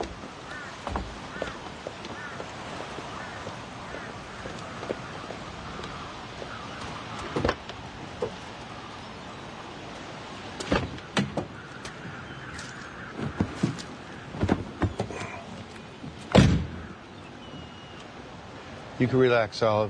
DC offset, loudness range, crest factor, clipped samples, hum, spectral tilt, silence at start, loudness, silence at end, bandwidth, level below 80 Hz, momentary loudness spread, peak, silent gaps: under 0.1%; 9 LU; 26 dB; under 0.1%; none; -6 dB/octave; 0 s; -32 LUFS; 0 s; 10.5 kHz; -46 dBFS; 17 LU; -4 dBFS; none